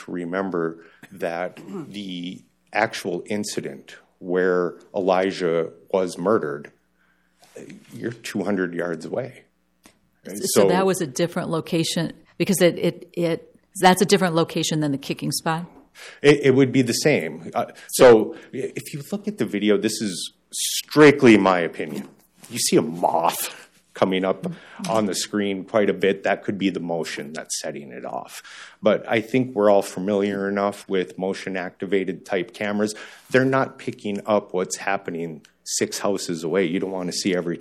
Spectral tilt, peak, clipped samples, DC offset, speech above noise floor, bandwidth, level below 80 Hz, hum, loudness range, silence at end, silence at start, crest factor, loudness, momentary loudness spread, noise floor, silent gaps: -4.5 dB/octave; -4 dBFS; under 0.1%; under 0.1%; 42 dB; 16.5 kHz; -62 dBFS; none; 8 LU; 0 s; 0 s; 18 dB; -22 LUFS; 15 LU; -64 dBFS; none